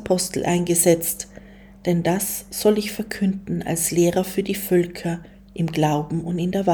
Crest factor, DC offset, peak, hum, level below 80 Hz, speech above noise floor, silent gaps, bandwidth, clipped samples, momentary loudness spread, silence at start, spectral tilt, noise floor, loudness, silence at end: 18 dB; under 0.1%; -4 dBFS; none; -50 dBFS; 22 dB; none; over 20 kHz; under 0.1%; 11 LU; 0 s; -5 dB/octave; -44 dBFS; -22 LUFS; 0 s